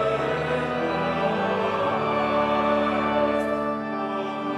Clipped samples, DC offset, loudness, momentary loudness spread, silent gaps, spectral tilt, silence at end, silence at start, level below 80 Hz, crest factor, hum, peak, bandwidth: under 0.1%; under 0.1%; -24 LUFS; 6 LU; none; -6.5 dB/octave; 0 s; 0 s; -52 dBFS; 14 dB; none; -10 dBFS; 12 kHz